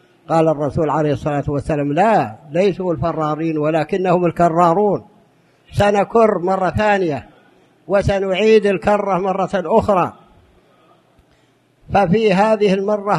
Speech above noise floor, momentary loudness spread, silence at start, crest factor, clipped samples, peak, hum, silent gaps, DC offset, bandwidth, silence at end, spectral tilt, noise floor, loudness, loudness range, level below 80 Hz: 41 dB; 6 LU; 0.3 s; 16 dB; under 0.1%; 0 dBFS; none; none; under 0.1%; 12 kHz; 0 s; -7 dB/octave; -56 dBFS; -17 LUFS; 2 LU; -42 dBFS